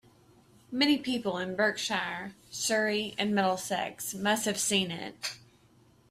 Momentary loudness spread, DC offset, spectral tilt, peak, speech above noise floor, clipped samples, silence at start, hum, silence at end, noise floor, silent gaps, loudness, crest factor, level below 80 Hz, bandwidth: 11 LU; under 0.1%; -3 dB/octave; -14 dBFS; 32 dB; under 0.1%; 0.7 s; none; 0.75 s; -62 dBFS; none; -30 LUFS; 18 dB; -70 dBFS; 15.5 kHz